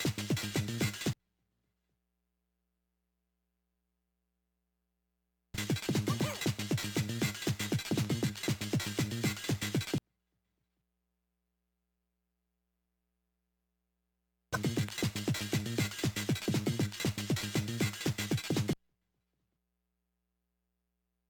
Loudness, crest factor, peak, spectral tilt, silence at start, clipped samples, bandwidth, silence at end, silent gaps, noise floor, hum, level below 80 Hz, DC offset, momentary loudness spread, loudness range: -34 LUFS; 18 dB; -18 dBFS; -4.5 dB/octave; 0 s; under 0.1%; 19 kHz; 2.55 s; none; -84 dBFS; 60 Hz at -65 dBFS; -64 dBFS; under 0.1%; 3 LU; 9 LU